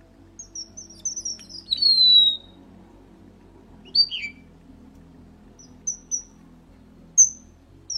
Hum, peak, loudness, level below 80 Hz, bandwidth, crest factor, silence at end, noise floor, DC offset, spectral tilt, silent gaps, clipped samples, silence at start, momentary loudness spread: none; -6 dBFS; -18 LUFS; -56 dBFS; 15 kHz; 20 dB; 0 s; -50 dBFS; under 0.1%; 2 dB/octave; none; under 0.1%; 0.4 s; 23 LU